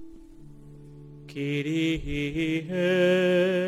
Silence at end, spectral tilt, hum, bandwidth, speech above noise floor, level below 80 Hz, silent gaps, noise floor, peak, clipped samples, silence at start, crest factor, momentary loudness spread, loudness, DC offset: 0 s; -6.5 dB/octave; none; 15 kHz; 22 dB; -46 dBFS; none; -47 dBFS; -12 dBFS; under 0.1%; 0 s; 14 dB; 16 LU; -25 LUFS; under 0.1%